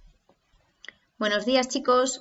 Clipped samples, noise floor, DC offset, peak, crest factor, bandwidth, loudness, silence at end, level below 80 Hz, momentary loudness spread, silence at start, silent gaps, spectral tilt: under 0.1%; -66 dBFS; under 0.1%; -10 dBFS; 18 dB; 8 kHz; -24 LUFS; 0 s; -62 dBFS; 23 LU; 1.2 s; none; -2 dB/octave